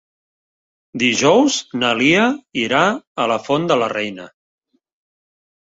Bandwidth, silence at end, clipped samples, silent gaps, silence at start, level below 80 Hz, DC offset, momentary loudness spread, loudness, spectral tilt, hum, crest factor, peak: 8 kHz; 1.5 s; under 0.1%; 3.07-3.15 s; 0.95 s; -60 dBFS; under 0.1%; 10 LU; -17 LUFS; -3.5 dB/octave; none; 18 dB; -2 dBFS